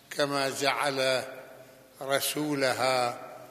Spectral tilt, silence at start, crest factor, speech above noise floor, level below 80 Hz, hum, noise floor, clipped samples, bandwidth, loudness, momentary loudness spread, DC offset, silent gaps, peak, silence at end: -3 dB/octave; 0.1 s; 22 dB; 23 dB; -78 dBFS; none; -52 dBFS; under 0.1%; 15 kHz; -28 LUFS; 15 LU; under 0.1%; none; -8 dBFS; 0 s